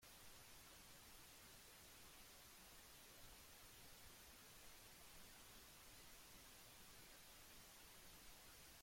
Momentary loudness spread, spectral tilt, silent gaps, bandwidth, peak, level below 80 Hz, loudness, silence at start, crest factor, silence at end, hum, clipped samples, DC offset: 0 LU; -1.5 dB/octave; none; 16.5 kHz; -50 dBFS; -74 dBFS; -62 LUFS; 0 s; 14 dB; 0 s; none; under 0.1%; under 0.1%